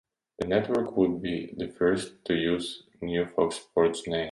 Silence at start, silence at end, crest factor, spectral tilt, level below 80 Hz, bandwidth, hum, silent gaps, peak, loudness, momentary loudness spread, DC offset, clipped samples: 0.4 s; 0 s; 18 dB; -5.5 dB/octave; -56 dBFS; 11.5 kHz; none; none; -10 dBFS; -28 LUFS; 8 LU; under 0.1%; under 0.1%